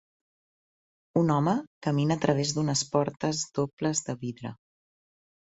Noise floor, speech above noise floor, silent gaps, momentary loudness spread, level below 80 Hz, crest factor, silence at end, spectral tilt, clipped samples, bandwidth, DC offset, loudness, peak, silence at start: under -90 dBFS; over 63 dB; 1.67-1.81 s, 3.73-3.77 s; 10 LU; -64 dBFS; 22 dB; 0.95 s; -5 dB/octave; under 0.1%; 8.4 kHz; under 0.1%; -28 LUFS; -8 dBFS; 1.15 s